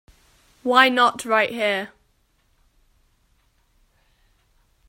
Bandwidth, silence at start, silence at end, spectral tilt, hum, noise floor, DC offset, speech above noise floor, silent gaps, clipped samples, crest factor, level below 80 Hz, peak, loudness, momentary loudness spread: 16 kHz; 0.65 s; 3 s; -2.5 dB/octave; none; -65 dBFS; under 0.1%; 45 dB; none; under 0.1%; 24 dB; -64 dBFS; 0 dBFS; -19 LUFS; 14 LU